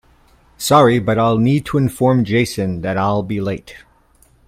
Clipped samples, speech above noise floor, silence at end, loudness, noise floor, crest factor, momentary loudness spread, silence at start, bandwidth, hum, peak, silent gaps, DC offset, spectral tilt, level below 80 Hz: under 0.1%; 38 dB; 0.7 s; -16 LUFS; -53 dBFS; 16 dB; 10 LU; 0.6 s; 16.5 kHz; none; 0 dBFS; none; under 0.1%; -6 dB/octave; -46 dBFS